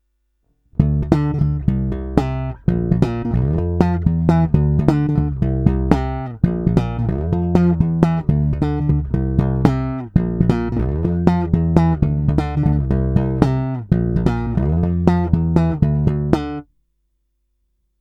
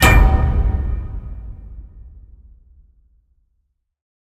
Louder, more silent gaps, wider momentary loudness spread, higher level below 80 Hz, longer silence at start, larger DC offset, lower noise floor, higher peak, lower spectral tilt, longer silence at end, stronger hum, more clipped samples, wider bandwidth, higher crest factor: about the same, -18 LUFS vs -18 LUFS; neither; second, 4 LU vs 26 LU; second, -26 dBFS vs -20 dBFS; first, 0.8 s vs 0 s; neither; about the same, -68 dBFS vs -69 dBFS; about the same, 0 dBFS vs 0 dBFS; first, -10 dB/octave vs -5 dB/octave; second, 1.4 s vs 2.25 s; neither; neither; second, 7.4 kHz vs 16.5 kHz; about the same, 18 dB vs 18 dB